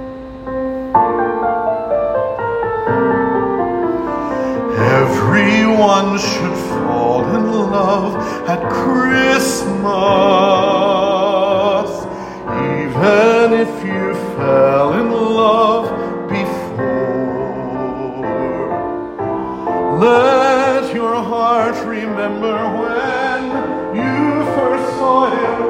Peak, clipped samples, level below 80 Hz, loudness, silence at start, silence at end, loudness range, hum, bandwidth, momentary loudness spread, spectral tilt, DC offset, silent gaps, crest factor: 0 dBFS; under 0.1%; -44 dBFS; -15 LUFS; 0 s; 0 s; 4 LU; none; 16 kHz; 10 LU; -5.5 dB/octave; under 0.1%; none; 14 dB